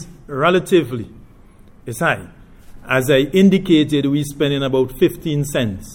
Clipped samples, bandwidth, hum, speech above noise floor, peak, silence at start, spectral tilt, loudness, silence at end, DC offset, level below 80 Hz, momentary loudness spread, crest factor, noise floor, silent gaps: under 0.1%; 18 kHz; none; 28 dB; -2 dBFS; 0 s; -6 dB/octave; -17 LUFS; 0 s; under 0.1%; -42 dBFS; 14 LU; 16 dB; -44 dBFS; none